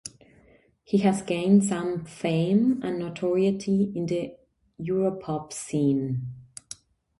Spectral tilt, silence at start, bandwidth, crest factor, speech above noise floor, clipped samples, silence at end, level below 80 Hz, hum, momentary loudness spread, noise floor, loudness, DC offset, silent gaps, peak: -6.5 dB/octave; 0.05 s; 11.5 kHz; 18 dB; 34 dB; under 0.1%; 0.45 s; -62 dBFS; none; 18 LU; -59 dBFS; -26 LUFS; under 0.1%; none; -8 dBFS